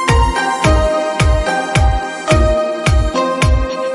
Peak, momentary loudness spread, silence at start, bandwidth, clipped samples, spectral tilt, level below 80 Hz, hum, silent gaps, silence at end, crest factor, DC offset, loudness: 0 dBFS; 3 LU; 0 s; 11.5 kHz; under 0.1%; -5.5 dB/octave; -18 dBFS; none; none; 0 s; 14 dB; under 0.1%; -14 LUFS